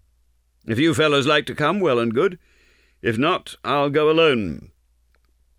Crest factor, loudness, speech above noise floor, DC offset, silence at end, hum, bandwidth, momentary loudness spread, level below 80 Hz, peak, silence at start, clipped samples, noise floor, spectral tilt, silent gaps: 16 dB; -20 LUFS; 43 dB; under 0.1%; 1 s; none; 14.5 kHz; 11 LU; -54 dBFS; -4 dBFS; 0.65 s; under 0.1%; -62 dBFS; -5.5 dB/octave; none